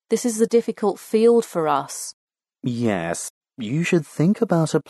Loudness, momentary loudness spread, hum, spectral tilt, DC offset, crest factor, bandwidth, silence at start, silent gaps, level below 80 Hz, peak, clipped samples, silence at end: -21 LUFS; 14 LU; none; -6 dB/octave; under 0.1%; 16 dB; 12.5 kHz; 0.1 s; 2.13-2.27 s, 3.30-3.41 s; -66 dBFS; -6 dBFS; under 0.1%; 0.1 s